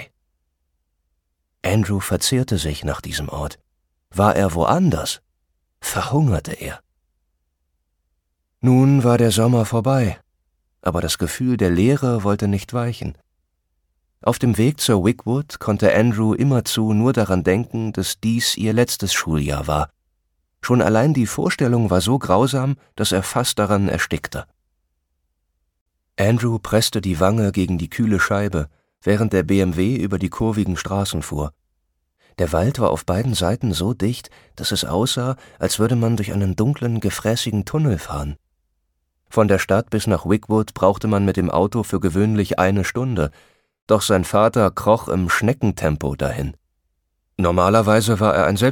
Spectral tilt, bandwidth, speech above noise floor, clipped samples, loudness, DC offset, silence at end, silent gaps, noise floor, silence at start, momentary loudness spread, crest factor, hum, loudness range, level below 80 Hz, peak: -5.5 dB/octave; 18.5 kHz; 54 dB; under 0.1%; -19 LUFS; under 0.1%; 0 s; 25.81-25.86 s, 43.82-43.87 s; -72 dBFS; 0 s; 10 LU; 18 dB; none; 4 LU; -40 dBFS; -2 dBFS